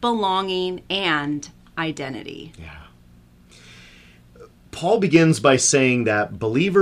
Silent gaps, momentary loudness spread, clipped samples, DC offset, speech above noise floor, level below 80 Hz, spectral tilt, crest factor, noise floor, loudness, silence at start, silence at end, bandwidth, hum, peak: none; 21 LU; under 0.1%; under 0.1%; 30 dB; -54 dBFS; -4 dB/octave; 18 dB; -50 dBFS; -20 LUFS; 0 s; 0 s; 15 kHz; 60 Hz at -60 dBFS; -4 dBFS